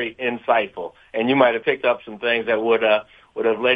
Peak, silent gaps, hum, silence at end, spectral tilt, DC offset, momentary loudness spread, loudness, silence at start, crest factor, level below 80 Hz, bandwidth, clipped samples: -2 dBFS; none; none; 0 s; -7 dB/octave; under 0.1%; 11 LU; -20 LUFS; 0 s; 20 dB; -62 dBFS; 4.9 kHz; under 0.1%